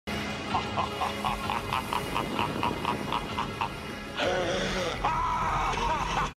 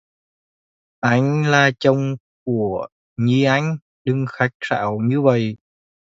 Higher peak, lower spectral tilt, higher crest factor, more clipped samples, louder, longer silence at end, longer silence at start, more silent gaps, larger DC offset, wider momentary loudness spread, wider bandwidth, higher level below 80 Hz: second, -14 dBFS vs -2 dBFS; second, -4.5 dB/octave vs -6.5 dB/octave; about the same, 16 dB vs 18 dB; neither; second, -30 LUFS vs -19 LUFS; second, 0.05 s vs 0.6 s; second, 0.05 s vs 1.05 s; second, none vs 2.20-2.46 s, 2.92-3.16 s, 3.82-4.05 s, 4.55-4.60 s; neither; second, 5 LU vs 11 LU; first, 16 kHz vs 7.8 kHz; first, -44 dBFS vs -58 dBFS